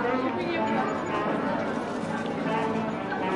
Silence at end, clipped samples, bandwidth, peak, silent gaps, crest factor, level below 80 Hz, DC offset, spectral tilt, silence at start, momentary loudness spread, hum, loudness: 0 s; under 0.1%; 11.5 kHz; -16 dBFS; none; 12 dB; -60 dBFS; under 0.1%; -6.5 dB/octave; 0 s; 4 LU; none; -28 LUFS